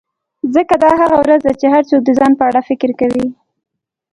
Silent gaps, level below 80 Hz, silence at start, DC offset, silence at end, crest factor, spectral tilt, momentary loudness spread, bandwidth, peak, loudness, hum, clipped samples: none; -48 dBFS; 0.45 s; under 0.1%; 0.8 s; 12 dB; -6.5 dB/octave; 7 LU; 11 kHz; 0 dBFS; -12 LUFS; none; under 0.1%